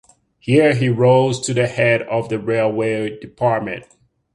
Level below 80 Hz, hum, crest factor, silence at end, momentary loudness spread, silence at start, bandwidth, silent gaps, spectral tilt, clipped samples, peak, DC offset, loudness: -54 dBFS; none; 16 dB; 0.5 s; 11 LU; 0.45 s; 11.5 kHz; none; -6 dB/octave; under 0.1%; -2 dBFS; under 0.1%; -17 LUFS